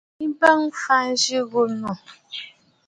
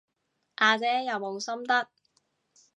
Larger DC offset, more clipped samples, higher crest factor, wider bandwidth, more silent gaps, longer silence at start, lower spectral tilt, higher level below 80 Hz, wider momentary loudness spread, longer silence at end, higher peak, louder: neither; neither; about the same, 22 dB vs 22 dB; first, 11.5 kHz vs 10 kHz; neither; second, 0.2 s vs 0.6 s; about the same, -2.5 dB/octave vs -2 dB/octave; first, -68 dBFS vs -88 dBFS; first, 18 LU vs 14 LU; second, 0.4 s vs 0.95 s; first, 0 dBFS vs -8 dBFS; first, -20 LUFS vs -27 LUFS